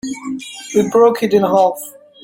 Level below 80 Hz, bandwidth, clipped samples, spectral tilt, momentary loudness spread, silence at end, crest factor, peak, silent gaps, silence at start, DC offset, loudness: -58 dBFS; 17 kHz; under 0.1%; -5 dB/octave; 15 LU; 0.35 s; 14 dB; -2 dBFS; none; 0.05 s; under 0.1%; -14 LUFS